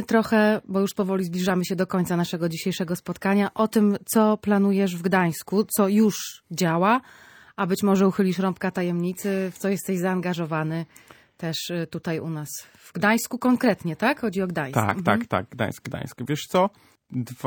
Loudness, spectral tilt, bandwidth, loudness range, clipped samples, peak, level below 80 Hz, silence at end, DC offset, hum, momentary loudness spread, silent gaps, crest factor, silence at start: -24 LUFS; -5.5 dB/octave; 19 kHz; 6 LU; under 0.1%; -4 dBFS; -62 dBFS; 0 s; under 0.1%; none; 10 LU; none; 20 dB; 0 s